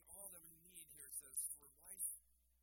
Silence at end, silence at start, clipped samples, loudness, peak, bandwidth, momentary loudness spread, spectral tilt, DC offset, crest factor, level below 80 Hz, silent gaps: 0.3 s; 0 s; under 0.1%; -50 LUFS; -30 dBFS; 17 kHz; 13 LU; -0.5 dB/octave; under 0.1%; 24 dB; -80 dBFS; none